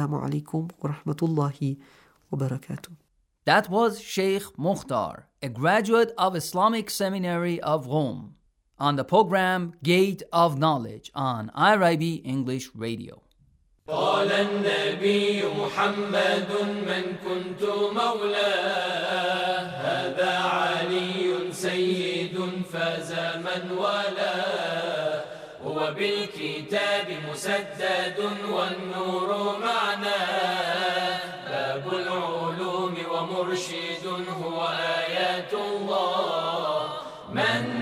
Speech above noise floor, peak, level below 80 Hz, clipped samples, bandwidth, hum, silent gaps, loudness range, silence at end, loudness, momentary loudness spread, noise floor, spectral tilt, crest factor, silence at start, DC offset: 36 dB; -6 dBFS; -68 dBFS; under 0.1%; 16 kHz; none; none; 4 LU; 0 s; -26 LUFS; 9 LU; -62 dBFS; -5 dB/octave; 20 dB; 0 s; under 0.1%